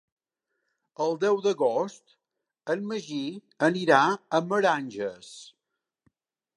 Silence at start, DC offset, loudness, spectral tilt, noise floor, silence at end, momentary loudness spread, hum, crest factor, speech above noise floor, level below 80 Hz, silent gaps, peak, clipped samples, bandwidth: 1 s; under 0.1%; -26 LUFS; -5 dB/octave; -85 dBFS; 1.05 s; 15 LU; none; 24 dB; 59 dB; -80 dBFS; none; -6 dBFS; under 0.1%; 11 kHz